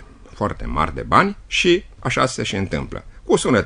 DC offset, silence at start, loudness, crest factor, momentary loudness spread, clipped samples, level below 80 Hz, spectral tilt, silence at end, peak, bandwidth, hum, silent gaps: under 0.1%; 0 s; -20 LUFS; 20 dB; 10 LU; under 0.1%; -36 dBFS; -4.5 dB/octave; 0 s; 0 dBFS; 10.5 kHz; none; none